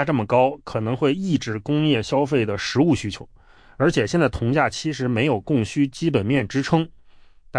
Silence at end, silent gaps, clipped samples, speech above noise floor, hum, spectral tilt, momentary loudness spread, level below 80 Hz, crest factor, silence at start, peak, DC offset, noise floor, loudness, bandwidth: 0 s; none; under 0.1%; 27 dB; none; -6 dB/octave; 5 LU; -48 dBFS; 16 dB; 0 s; -6 dBFS; under 0.1%; -48 dBFS; -21 LUFS; 10.5 kHz